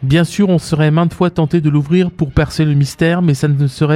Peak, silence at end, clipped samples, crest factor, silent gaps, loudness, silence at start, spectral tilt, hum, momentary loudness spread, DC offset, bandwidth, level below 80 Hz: 0 dBFS; 0 s; under 0.1%; 12 dB; none; -14 LUFS; 0 s; -7 dB/octave; none; 2 LU; under 0.1%; 13 kHz; -34 dBFS